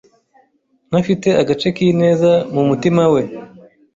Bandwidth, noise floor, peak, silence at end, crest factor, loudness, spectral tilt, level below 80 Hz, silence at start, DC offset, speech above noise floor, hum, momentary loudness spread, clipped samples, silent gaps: 7.8 kHz; -60 dBFS; -2 dBFS; 0.5 s; 14 dB; -15 LUFS; -7 dB/octave; -52 dBFS; 0.9 s; under 0.1%; 46 dB; none; 6 LU; under 0.1%; none